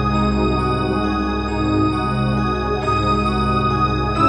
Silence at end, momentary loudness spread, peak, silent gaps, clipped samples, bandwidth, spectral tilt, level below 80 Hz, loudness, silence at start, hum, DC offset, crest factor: 0 s; 2 LU; -4 dBFS; none; under 0.1%; 10 kHz; -7.5 dB/octave; -28 dBFS; -19 LUFS; 0 s; none; under 0.1%; 14 dB